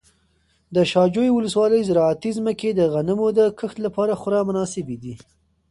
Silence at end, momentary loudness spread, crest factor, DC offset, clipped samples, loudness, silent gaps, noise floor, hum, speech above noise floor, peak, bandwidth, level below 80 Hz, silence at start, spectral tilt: 0.55 s; 10 LU; 16 dB; under 0.1%; under 0.1%; -20 LUFS; none; -63 dBFS; none; 44 dB; -4 dBFS; 11.5 kHz; -56 dBFS; 0.7 s; -6.5 dB/octave